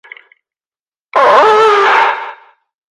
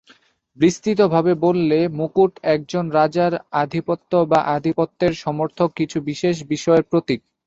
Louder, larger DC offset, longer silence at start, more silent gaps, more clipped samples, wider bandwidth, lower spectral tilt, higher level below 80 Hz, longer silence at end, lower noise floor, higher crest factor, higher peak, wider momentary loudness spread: first, -9 LUFS vs -19 LUFS; neither; first, 1.15 s vs 0.6 s; neither; neither; first, 11 kHz vs 8 kHz; second, -2 dB/octave vs -6.5 dB/octave; second, -62 dBFS vs -56 dBFS; first, 0.55 s vs 0.3 s; first, under -90 dBFS vs -55 dBFS; about the same, 12 dB vs 16 dB; about the same, 0 dBFS vs -2 dBFS; first, 13 LU vs 6 LU